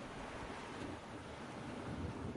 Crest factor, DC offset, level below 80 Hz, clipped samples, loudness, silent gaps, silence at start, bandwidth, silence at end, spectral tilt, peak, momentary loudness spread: 14 dB; under 0.1%; -60 dBFS; under 0.1%; -47 LUFS; none; 0 s; 11.5 kHz; 0 s; -5.5 dB/octave; -32 dBFS; 4 LU